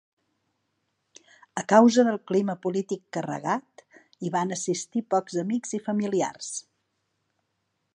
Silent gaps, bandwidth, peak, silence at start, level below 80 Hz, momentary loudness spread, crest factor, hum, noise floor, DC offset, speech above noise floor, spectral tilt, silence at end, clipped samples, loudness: none; 10.5 kHz; -4 dBFS; 1.55 s; -78 dBFS; 16 LU; 24 dB; none; -77 dBFS; under 0.1%; 52 dB; -5 dB/octave; 1.35 s; under 0.1%; -26 LUFS